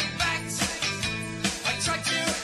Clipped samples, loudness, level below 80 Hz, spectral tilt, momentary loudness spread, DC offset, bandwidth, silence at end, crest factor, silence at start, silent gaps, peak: under 0.1%; -27 LUFS; -50 dBFS; -2 dB/octave; 4 LU; under 0.1%; 13 kHz; 0 s; 18 dB; 0 s; none; -10 dBFS